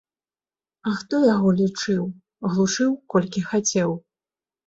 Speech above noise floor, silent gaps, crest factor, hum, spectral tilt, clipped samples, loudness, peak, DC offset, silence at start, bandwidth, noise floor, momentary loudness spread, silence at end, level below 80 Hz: over 69 dB; none; 18 dB; none; -5 dB/octave; under 0.1%; -22 LUFS; -6 dBFS; under 0.1%; 0.85 s; 8 kHz; under -90 dBFS; 11 LU; 0.7 s; -62 dBFS